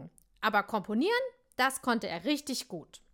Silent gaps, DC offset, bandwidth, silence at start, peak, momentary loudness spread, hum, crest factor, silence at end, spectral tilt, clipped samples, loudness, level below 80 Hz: none; under 0.1%; 17 kHz; 0 s; -14 dBFS; 9 LU; none; 20 dB; 0.15 s; -3.5 dB/octave; under 0.1%; -31 LUFS; -68 dBFS